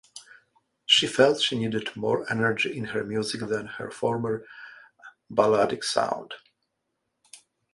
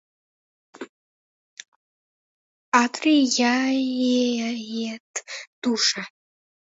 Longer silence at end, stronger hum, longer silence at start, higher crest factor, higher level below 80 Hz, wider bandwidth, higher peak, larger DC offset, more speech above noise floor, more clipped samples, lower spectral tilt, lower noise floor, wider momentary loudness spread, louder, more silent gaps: second, 0.4 s vs 0.65 s; neither; second, 0.15 s vs 0.8 s; about the same, 22 dB vs 22 dB; first, -66 dBFS vs -78 dBFS; first, 11.5 kHz vs 8 kHz; about the same, -4 dBFS vs -4 dBFS; neither; second, 53 dB vs over 68 dB; neither; first, -3.5 dB/octave vs -2 dB/octave; second, -79 dBFS vs under -90 dBFS; first, 22 LU vs 19 LU; second, -25 LUFS vs -22 LUFS; second, none vs 0.89-1.57 s, 1.68-2.72 s, 5.00-5.14 s, 5.47-5.62 s